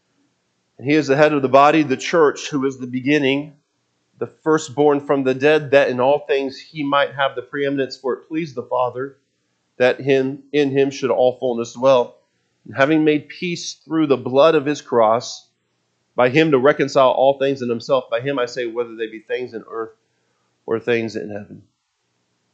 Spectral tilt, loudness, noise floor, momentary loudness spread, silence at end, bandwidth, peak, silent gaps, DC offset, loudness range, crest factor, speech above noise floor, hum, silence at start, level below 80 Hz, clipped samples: -5.5 dB/octave; -18 LUFS; -70 dBFS; 15 LU; 0.95 s; 8.4 kHz; 0 dBFS; none; under 0.1%; 7 LU; 18 dB; 52 dB; none; 0.8 s; -70 dBFS; under 0.1%